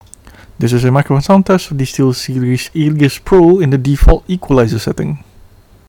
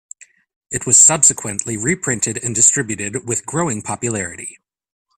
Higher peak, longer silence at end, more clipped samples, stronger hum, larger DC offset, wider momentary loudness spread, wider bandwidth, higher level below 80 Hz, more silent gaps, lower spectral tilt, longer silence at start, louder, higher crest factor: about the same, 0 dBFS vs 0 dBFS; about the same, 0.7 s vs 0.65 s; neither; neither; neither; second, 9 LU vs 16 LU; second, 18 kHz vs over 20 kHz; first, -20 dBFS vs -54 dBFS; neither; first, -7 dB/octave vs -2.5 dB/octave; second, 0.25 s vs 0.7 s; first, -12 LUFS vs -15 LUFS; second, 12 dB vs 18 dB